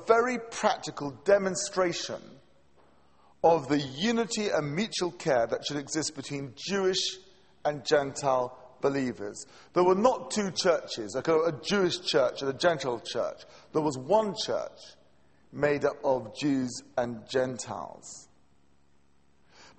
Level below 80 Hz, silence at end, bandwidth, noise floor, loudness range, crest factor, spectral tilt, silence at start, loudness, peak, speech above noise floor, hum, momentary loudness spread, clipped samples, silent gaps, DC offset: -64 dBFS; 1.55 s; 8.8 kHz; -67 dBFS; 4 LU; 22 dB; -4 dB/octave; 0 s; -29 LUFS; -8 dBFS; 39 dB; none; 12 LU; under 0.1%; none; under 0.1%